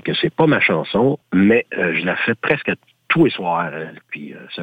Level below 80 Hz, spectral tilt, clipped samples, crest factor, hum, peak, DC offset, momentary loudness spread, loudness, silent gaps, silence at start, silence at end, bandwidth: -56 dBFS; -8.5 dB/octave; under 0.1%; 14 dB; none; -4 dBFS; under 0.1%; 16 LU; -17 LUFS; none; 0.05 s; 0 s; 8 kHz